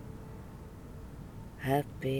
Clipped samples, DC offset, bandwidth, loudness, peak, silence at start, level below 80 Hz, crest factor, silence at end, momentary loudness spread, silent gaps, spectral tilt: under 0.1%; under 0.1%; 19.5 kHz; -38 LUFS; -16 dBFS; 0 s; -52 dBFS; 20 dB; 0 s; 16 LU; none; -7 dB/octave